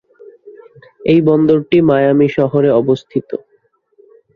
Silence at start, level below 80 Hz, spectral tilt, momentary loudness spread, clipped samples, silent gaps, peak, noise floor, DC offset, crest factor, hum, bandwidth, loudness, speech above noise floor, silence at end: 0.45 s; -52 dBFS; -9 dB/octave; 11 LU; under 0.1%; none; 0 dBFS; -58 dBFS; under 0.1%; 14 dB; none; 7 kHz; -13 LUFS; 46 dB; 1 s